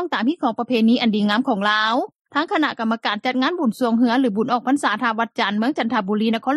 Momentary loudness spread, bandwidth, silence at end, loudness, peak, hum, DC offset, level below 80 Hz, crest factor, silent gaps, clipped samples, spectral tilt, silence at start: 4 LU; 12.5 kHz; 0 s; -20 LUFS; -4 dBFS; none; under 0.1%; -70 dBFS; 14 dB; 2.21-2.25 s; under 0.1%; -5.5 dB/octave; 0 s